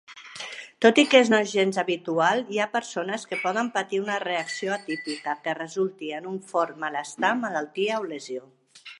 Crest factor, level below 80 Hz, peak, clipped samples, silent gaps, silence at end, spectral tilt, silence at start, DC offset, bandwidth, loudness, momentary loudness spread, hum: 24 dB; -78 dBFS; -2 dBFS; under 0.1%; none; 0.05 s; -3.5 dB/octave; 0.1 s; under 0.1%; 11.5 kHz; -25 LUFS; 15 LU; none